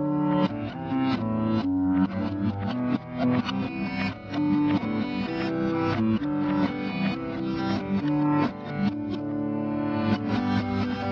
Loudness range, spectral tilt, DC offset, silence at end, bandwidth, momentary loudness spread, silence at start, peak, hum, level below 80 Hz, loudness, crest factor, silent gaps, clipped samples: 1 LU; -8.5 dB/octave; under 0.1%; 0 s; 6.4 kHz; 5 LU; 0 s; -10 dBFS; none; -54 dBFS; -27 LUFS; 16 dB; none; under 0.1%